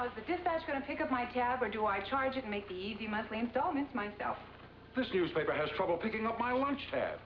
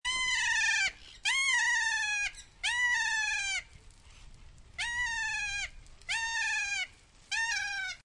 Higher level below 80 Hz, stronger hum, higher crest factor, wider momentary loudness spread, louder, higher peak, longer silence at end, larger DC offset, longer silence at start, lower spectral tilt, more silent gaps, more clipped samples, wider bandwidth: second, -62 dBFS vs -56 dBFS; neither; about the same, 16 dB vs 16 dB; second, 7 LU vs 10 LU; second, -35 LUFS vs -30 LUFS; about the same, -20 dBFS vs -18 dBFS; about the same, 0 s vs 0.1 s; neither; about the same, 0 s vs 0.05 s; first, -3 dB/octave vs 2.5 dB/octave; neither; neither; second, 5.4 kHz vs 11.5 kHz